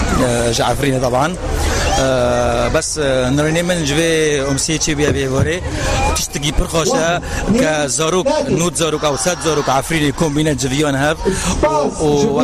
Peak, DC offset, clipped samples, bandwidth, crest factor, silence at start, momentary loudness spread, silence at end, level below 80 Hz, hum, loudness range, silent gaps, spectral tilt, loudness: -4 dBFS; under 0.1%; under 0.1%; 15.5 kHz; 10 dB; 0 s; 3 LU; 0 s; -26 dBFS; none; 1 LU; none; -4 dB/octave; -16 LUFS